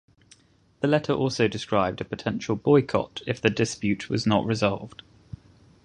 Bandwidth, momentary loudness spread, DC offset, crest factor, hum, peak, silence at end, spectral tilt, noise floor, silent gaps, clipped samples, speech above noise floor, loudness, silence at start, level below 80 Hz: 10.5 kHz; 17 LU; under 0.1%; 22 dB; none; -4 dBFS; 0.95 s; -6 dB/octave; -59 dBFS; none; under 0.1%; 35 dB; -25 LUFS; 0.8 s; -54 dBFS